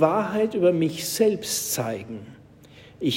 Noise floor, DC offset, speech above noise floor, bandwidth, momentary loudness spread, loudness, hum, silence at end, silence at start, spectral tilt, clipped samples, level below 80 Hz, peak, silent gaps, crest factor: -49 dBFS; under 0.1%; 26 dB; 16.5 kHz; 12 LU; -24 LUFS; none; 0 s; 0 s; -4.5 dB/octave; under 0.1%; -62 dBFS; -6 dBFS; none; 18 dB